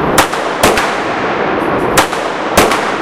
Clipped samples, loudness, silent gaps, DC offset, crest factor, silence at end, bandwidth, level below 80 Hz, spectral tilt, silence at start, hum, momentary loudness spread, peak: 0.3%; -12 LUFS; none; under 0.1%; 12 dB; 0 s; over 20 kHz; -34 dBFS; -3 dB/octave; 0 s; none; 5 LU; 0 dBFS